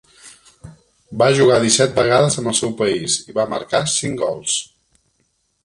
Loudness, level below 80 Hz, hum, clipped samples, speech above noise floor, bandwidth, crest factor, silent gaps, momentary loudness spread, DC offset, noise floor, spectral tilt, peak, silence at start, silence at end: -17 LUFS; -54 dBFS; none; under 0.1%; 49 dB; 11.5 kHz; 18 dB; none; 8 LU; under 0.1%; -66 dBFS; -3.5 dB/octave; 0 dBFS; 0.25 s; 1 s